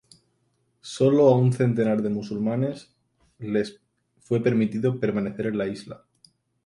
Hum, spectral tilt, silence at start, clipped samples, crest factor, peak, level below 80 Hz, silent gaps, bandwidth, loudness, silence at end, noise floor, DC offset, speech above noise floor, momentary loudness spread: none; -8 dB/octave; 0.85 s; under 0.1%; 18 dB; -6 dBFS; -64 dBFS; none; 11.5 kHz; -24 LUFS; 0.7 s; -70 dBFS; under 0.1%; 47 dB; 20 LU